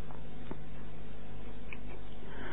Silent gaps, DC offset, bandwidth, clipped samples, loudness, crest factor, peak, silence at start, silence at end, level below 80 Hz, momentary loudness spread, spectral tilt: none; 4%; 4 kHz; under 0.1%; -48 LUFS; 18 dB; -22 dBFS; 0 s; 0 s; -50 dBFS; 2 LU; -9 dB/octave